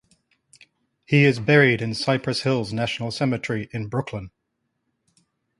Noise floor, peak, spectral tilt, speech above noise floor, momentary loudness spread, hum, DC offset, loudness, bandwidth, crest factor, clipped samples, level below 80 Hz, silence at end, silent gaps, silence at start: -76 dBFS; -2 dBFS; -6 dB/octave; 55 dB; 12 LU; none; under 0.1%; -22 LUFS; 11.5 kHz; 22 dB; under 0.1%; -56 dBFS; 1.3 s; none; 1.1 s